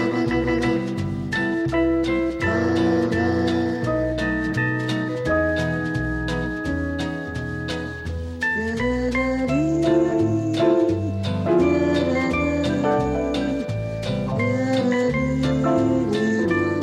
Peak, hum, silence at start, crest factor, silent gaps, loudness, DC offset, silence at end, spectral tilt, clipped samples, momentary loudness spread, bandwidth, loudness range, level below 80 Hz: -8 dBFS; none; 0 s; 14 dB; none; -22 LUFS; under 0.1%; 0 s; -7 dB/octave; under 0.1%; 7 LU; 11 kHz; 4 LU; -38 dBFS